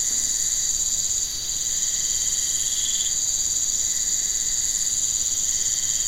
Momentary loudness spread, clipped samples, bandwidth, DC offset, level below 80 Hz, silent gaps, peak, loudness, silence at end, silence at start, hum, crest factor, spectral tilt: 1 LU; under 0.1%; 16 kHz; 0.6%; -44 dBFS; none; -10 dBFS; -20 LUFS; 0 s; 0 s; none; 14 dB; 1.5 dB/octave